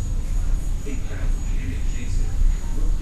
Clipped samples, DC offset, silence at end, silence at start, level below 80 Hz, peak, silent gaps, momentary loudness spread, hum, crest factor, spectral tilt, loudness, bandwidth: under 0.1%; under 0.1%; 0 s; 0 s; -22 dBFS; -8 dBFS; none; 4 LU; none; 12 dB; -6 dB/octave; -28 LUFS; 10 kHz